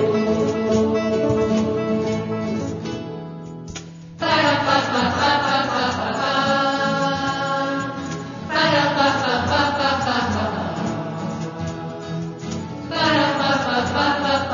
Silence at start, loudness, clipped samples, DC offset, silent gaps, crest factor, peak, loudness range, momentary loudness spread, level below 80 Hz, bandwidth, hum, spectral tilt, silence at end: 0 s; -21 LUFS; under 0.1%; under 0.1%; none; 18 dB; -4 dBFS; 4 LU; 12 LU; -52 dBFS; 7.4 kHz; none; -5 dB/octave; 0 s